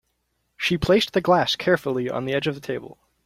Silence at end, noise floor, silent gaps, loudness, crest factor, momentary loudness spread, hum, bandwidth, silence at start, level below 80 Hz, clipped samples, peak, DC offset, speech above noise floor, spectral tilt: 0.35 s; -73 dBFS; none; -22 LUFS; 18 dB; 10 LU; none; 15.5 kHz; 0.6 s; -50 dBFS; under 0.1%; -6 dBFS; under 0.1%; 51 dB; -5 dB/octave